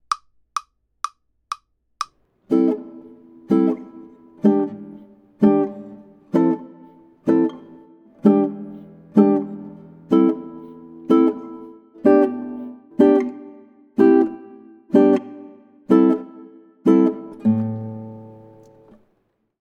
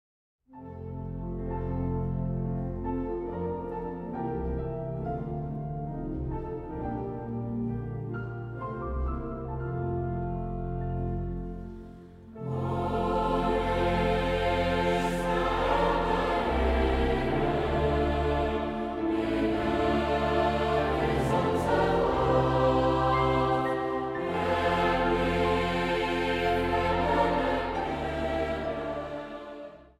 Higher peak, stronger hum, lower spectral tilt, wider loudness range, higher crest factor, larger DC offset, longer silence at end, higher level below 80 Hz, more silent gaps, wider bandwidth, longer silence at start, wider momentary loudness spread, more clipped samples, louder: first, -2 dBFS vs -12 dBFS; neither; about the same, -8 dB/octave vs -7 dB/octave; second, 4 LU vs 9 LU; about the same, 20 dB vs 16 dB; neither; first, 1.35 s vs 0.15 s; second, -68 dBFS vs -38 dBFS; neither; second, 10.5 kHz vs 14.5 kHz; second, 0.1 s vs 0.5 s; first, 22 LU vs 11 LU; neither; first, -19 LUFS vs -29 LUFS